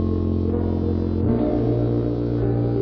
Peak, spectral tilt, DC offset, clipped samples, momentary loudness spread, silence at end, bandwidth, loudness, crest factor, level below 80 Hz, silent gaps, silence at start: -8 dBFS; -11.5 dB/octave; under 0.1%; under 0.1%; 2 LU; 0 s; 5.4 kHz; -22 LUFS; 14 dB; -34 dBFS; none; 0 s